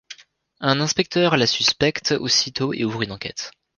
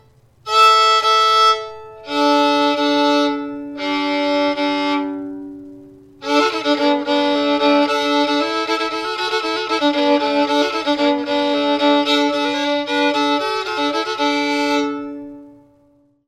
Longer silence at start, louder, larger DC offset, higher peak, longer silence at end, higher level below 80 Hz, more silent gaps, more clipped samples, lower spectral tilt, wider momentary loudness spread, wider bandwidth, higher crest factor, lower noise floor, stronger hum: second, 0.1 s vs 0.45 s; second, -20 LUFS vs -16 LUFS; neither; about the same, -2 dBFS vs -2 dBFS; second, 0.25 s vs 0.75 s; first, -54 dBFS vs -62 dBFS; neither; neither; about the same, -3.5 dB/octave vs -2.5 dB/octave; second, 10 LU vs 13 LU; second, 11 kHz vs 13.5 kHz; first, 22 dB vs 16 dB; second, -45 dBFS vs -56 dBFS; neither